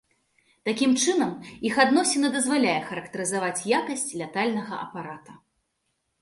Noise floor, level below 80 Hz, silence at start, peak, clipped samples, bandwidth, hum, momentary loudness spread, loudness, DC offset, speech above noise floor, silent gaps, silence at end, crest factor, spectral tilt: -76 dBFS; -68 dBFS; 0.65 s; -4 dBFS; under 0.1%; 11.5 kHz; none; 14 LU; -25 LUFS; under 0.1%; 51 dB; none; 0.85 s; 22 dB; -3 dB/octave